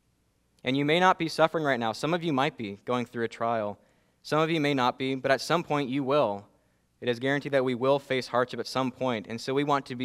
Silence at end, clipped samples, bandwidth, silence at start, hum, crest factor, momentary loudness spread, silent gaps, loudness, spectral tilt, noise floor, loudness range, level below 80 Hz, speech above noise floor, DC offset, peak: 0 s; under 0.1%; 15 kHz; 0.65 s; none; 22 dB; 7 LU; none; -28 LUFS; -5.5 dB/octave; -70 dBFS; 2 LU; -70 dBFS; 43 dB; under 0.1%; -6 dBFS